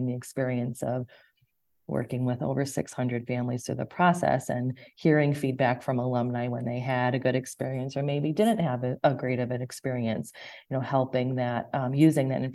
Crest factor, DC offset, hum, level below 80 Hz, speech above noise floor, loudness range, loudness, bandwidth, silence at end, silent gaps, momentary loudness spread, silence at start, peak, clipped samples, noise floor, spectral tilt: 20 dB; under 0.1%; none; -64 dBFS; 45 dB; 5 LU; -28 LUFS; 12.5 kHz; 0 s; none; 9 LU; 0 s; -8 dBFS; under 0.1%; -72 dBFS; -7 dB/octave